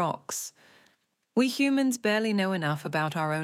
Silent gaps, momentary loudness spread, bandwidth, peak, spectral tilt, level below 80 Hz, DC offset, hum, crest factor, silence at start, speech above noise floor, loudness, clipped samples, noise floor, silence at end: none; 9 LU; 16.5 kHz; -14 dBFS; -4.5 dB/octave; -80 dBFS; under 0.1%; none; 14 dB; 0 s; 42 dB; -27 LUFS; under 0.1%; -69 dBFS; 0 s